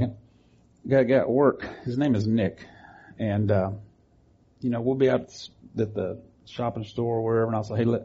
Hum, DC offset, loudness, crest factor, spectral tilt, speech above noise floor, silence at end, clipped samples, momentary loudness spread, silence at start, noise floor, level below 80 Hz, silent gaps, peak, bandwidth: none; under 0.1%; -26 LUFS; 18 dB; -7 dB/octave; 36 dB; 0 s; under 0.1%; 17 LU; 0 s; -60 dBFS; -58 dBFS; none; -8 dBFS; 7.6 kHz